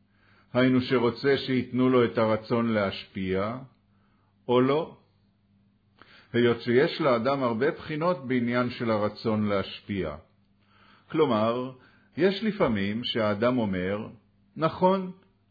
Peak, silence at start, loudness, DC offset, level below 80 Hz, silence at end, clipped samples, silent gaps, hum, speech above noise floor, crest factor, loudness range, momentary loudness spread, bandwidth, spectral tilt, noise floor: -10 dBFS; 0.55 s; -26 LUFS; under 0.1%; -60 dBFS; 0.4 s; under 0.1%; none; none; 40 dB; 18 dB; 4 LU; 10 LU; 5 kHz; -8.5 dB/octave; -65 dBFS